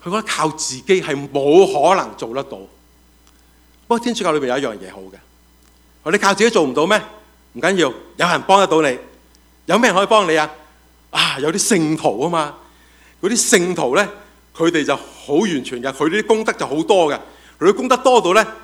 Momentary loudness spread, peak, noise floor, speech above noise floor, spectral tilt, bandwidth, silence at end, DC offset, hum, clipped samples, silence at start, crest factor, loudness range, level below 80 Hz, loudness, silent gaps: 12 LU; 0 dBFS; -51 dBFS; 35 dB; -3.5 dB/octave; 16.5 kHz; 0 s; under 0.1%; 60 Hz at -50 dBFS; under 0.1%; 0.05 s; 18 dB; 5 LU; -54 dBFS; -16 LUFS; none